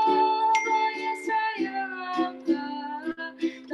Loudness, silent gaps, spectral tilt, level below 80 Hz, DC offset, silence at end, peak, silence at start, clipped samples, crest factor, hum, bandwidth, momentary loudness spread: -27 LUFS; none; -3 dB/octave; -76 dBFS; under 0.1%; 0 s; -10 dBFS; 0 s; under 0.1%; 16 dB; none; 12 kHz; 11 LU